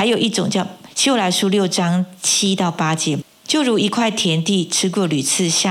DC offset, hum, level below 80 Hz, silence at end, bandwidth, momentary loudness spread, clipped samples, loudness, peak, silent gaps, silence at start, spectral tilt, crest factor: under 0.1%; none; -68 dBFS; 0 s; 16 kHz; 5 LU; under 0.1%; -17 LUFS; -4 dBFS; none; 0 s; -3.5 dB/octave; 14 dB